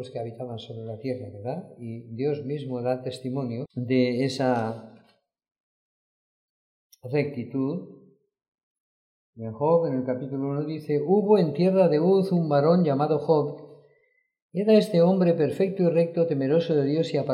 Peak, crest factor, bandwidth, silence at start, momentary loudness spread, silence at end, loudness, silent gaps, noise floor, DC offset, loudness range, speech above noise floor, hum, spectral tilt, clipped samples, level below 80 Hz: -8 dBFS; 18 dB; 11.5 kHz; 0 s; 15 LU; 0 s; -24 LUFS; 5.60-6.90 s, 8.48-8.52 s, 8.63-9.33 s, 14.42-14.49 s; -68 dBFS; under 0.1%; 12 LU; 44 dB; none; -8.5 dB/octave; under 0.1%; -74 dBFS